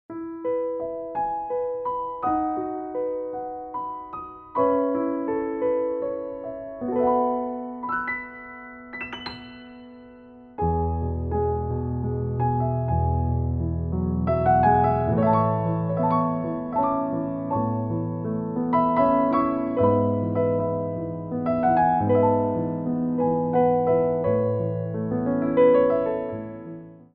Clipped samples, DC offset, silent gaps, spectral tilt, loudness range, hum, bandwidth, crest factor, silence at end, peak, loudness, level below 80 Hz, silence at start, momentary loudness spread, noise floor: under 0.1%; under 0.1%; none; -8 dB/octave; 7 LU; none; 4.8 kHz; 16 dB; 0.1 s; -8 dBFS; -24 LUFS; -42 dBFS; 0.1 s; 13 LU; -46 dBFS